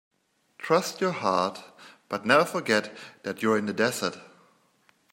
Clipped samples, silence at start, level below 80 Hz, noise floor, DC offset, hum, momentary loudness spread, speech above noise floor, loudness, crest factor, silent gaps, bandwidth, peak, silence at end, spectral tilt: under 0.1%; 0.6 s; -74 dBFS; -65 dBFS; under 0.1%; none; 17 LU; 39 dB; -26 LUFS; 24 dB; none; 16.5 kHz; -4 dBFS; 0.85 s; -4 dB/octave